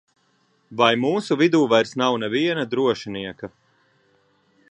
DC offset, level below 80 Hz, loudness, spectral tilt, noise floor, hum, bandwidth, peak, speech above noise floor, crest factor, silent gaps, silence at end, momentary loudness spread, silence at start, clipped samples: under 0.1%; -66 dBFS; -20 LUFS; -5 dB/octave; -64 dBFS; none; 10 kHz; -2 dBFS; 44 dB; 22 dB; none; 1.25 s; 16 LU; 0.7 s; under 0.1%